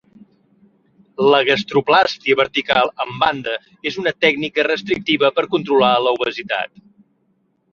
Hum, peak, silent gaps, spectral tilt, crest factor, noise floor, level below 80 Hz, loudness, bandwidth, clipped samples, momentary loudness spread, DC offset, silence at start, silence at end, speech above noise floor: none; -2 dBFS; none; -5 dB/octave; 18 dB; -64 dBFS; -58 dBFS; -17 LUFS; 7 kHz; under 0.1%; 9 LU; under 0.1%; 1.2 s; 1.05 s; 47 dB